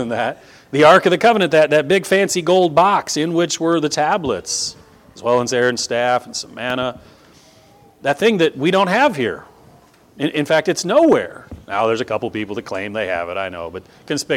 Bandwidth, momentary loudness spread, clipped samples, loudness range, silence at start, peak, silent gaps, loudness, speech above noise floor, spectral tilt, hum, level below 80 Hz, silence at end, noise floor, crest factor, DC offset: 16.5 kHz; 12 LU; under 0.1%; 6 LU; 0 s; 0 dBFS; none; -17 LUFS; 32 dB; -4 dB/octave; none; -54 dBFS; 0 s; -49 dBFS; 18 dB; under 0.1%